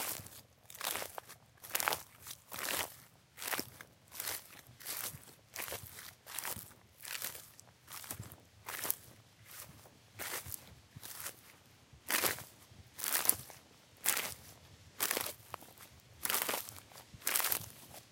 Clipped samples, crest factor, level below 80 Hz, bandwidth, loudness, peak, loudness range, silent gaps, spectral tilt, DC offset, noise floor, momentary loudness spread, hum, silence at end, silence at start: under 0.1%; 38 dB; -72 dBFS; 17 kHz; -38 LUFS; -4 dBFS; 8 LU; none; -0.5 dB/octave; under 0.1%; -62 dBFS; 23 LU; none; 0 s; 0 s